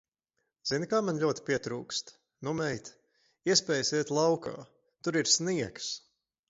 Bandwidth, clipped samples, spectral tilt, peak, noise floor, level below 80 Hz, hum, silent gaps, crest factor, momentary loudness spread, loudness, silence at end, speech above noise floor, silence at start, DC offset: 8 kHz; under 0.1%; -3 dB/octave; -10 dBFS; -83 dBFS; -70 dBFS; none; none; 24 dB; 15 LU; -30 LUFS; 0.5 s; 52 dB; 0.65 s; under 0.1%